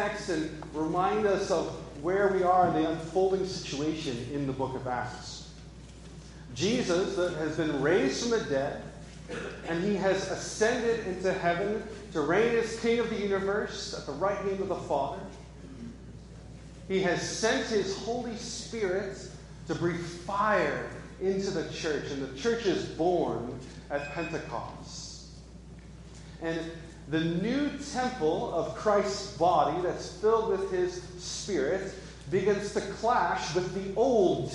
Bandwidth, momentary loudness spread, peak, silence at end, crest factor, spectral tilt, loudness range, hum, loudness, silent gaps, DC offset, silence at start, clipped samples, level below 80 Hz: 11.5 kHz; 18 LU; -12 dBFS; 0 s; 18 dB; -5 dB/octave; 6 LU; none; -30 LUFS; none; under 0.1%; 0 s; under 0.1%; -52 dBFS